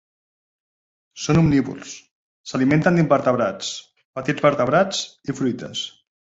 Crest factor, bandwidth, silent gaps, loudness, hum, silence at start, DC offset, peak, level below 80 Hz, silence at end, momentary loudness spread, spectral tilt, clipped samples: 18 dB; 8 kHz; 2.11-2.44 s, 4.05-4.14 s; -20 LUFS; none; 1.15 s; under 0.1%; -2 dBFS; -50 dBFS; 0.5 s; 18 LU; -5.5 dB/octave; under 0.1%